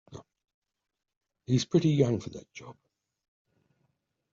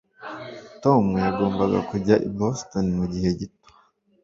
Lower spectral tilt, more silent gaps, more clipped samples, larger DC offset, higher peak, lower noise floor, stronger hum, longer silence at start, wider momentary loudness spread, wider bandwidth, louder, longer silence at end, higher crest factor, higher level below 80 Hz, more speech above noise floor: about the same, -7.5 dB/octave vs -7 dB/octave; first, 0.54-0.62 s, 1.17-1.21 s vs none; neither; neither; second, -12 dBFS vs -4 dBFS; first, -78 dBFS vs -60 dBFS; neither; about the same, 0.1 s vs 0.2 s; first, 22 LU vs 17 LU; about the same, 7.6 kHz vs 7.6 kHz; second, -27 LUFS vs -23 LUFS; first, 1.6 s vs 0.75 s; about the same, 22 dB vs 20 dB; second, -66 dBFS vs -48 dBFS; first, 50 dB vs 38 dB